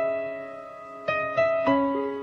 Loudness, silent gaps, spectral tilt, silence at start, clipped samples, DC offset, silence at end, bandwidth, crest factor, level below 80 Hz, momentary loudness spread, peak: -25 LUFS; none; -7 dB/octave; 0 s; under 0.1%; under 0.1%; 0 s; 6.6 kHz; 16 dB; -64 dBFS; 16 LU; -10 dBFS